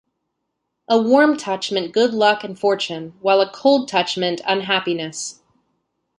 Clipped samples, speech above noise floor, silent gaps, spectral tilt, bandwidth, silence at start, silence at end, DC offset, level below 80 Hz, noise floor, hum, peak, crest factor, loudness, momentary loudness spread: under 0.1%; 58 dB; none; -3.5 dB/octave; 11.5 kHz; 0.9 s; 0.85 s; under 0.1%; -68 dBFS; -76 dBFS; none; -2 dBFS; 18 dB; -18 LUFS; 9 LU